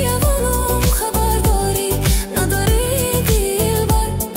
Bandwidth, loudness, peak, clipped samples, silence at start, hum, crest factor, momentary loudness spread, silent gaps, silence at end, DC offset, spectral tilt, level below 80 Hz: 16.5 kHz; -17 LUFS; -4 dBFS; under 0.1%; 0 s; none; 12 dB; 2 LU; none; 0 s; under 0.1%; -4.5 dB/octave; -20 dBFS